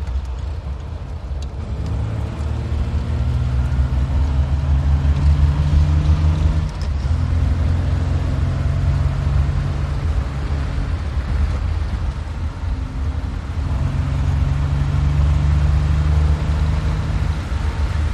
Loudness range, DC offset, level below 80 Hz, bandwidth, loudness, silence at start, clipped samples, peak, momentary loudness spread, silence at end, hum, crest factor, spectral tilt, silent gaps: 5 LU; under 0.1%; -20 dBFS; 8.6 kHz; -20 LUFS; 0 s; under 0.1%; -4 dBFS; 9 LU; 0 s; none; 14 dB; -7.5 dB/octave; none